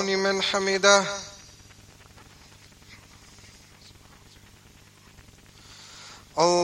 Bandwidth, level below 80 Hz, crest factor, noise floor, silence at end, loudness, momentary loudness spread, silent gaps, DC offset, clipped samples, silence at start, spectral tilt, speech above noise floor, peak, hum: 15.5 kHz; -60 dBFS; 26 dB; -53 dBFS; 0 s; -22 LUFS; 28 LU; none; under 0.1%; under 0.1%; 0 s; -2.5 dB/octave; 31 dB; -2 dBFS; 50 Hz at -60 dBFS